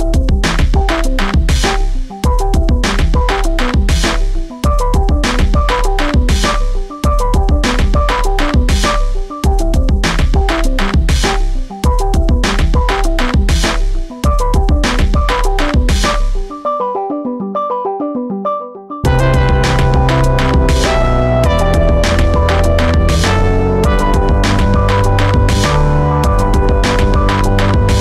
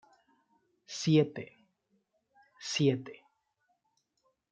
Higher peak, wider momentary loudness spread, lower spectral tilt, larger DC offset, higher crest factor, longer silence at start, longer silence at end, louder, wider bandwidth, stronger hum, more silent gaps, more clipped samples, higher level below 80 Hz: first, -4 dBFS vs -14 dBFS; second, 6 LU vs 20 LU; about the same, -5.5 dB/octave vs -5.5 dB/octave; neither; second, 8 dB vs 22 dB; second, 0 s vs 0.9 s; second, 0 s vs 1.4 s; first, -14 LUFS vs -30 LUFS; first, 13.5 kHz vs 9 kHz; neither; neither; neither; first, -14 dBFS vs -78 dBFS